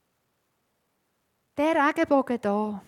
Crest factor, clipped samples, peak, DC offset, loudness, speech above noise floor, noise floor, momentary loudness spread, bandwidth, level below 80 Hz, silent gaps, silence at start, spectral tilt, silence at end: 18 dB; under 0.1%; -10 dBFS; under 0.1%; -24 LUFS; 50 dB; -74 dBFS; 6 LU; 15 kHz; -70 dBFS; none; 1.55 s; -6 dB/octave; 0.1 s